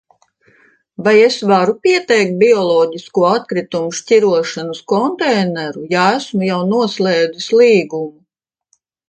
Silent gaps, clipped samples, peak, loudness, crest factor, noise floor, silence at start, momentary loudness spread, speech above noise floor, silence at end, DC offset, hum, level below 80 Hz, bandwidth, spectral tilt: none; under 0.1%; 0 dBFS; -14 LUFS; 14 dB; -74 dBFS; 1 s; 10 LU; 61 dB; 1 s; under 0.1%; none; -64 dBFS; 9.2 kHz; -5 dB/octave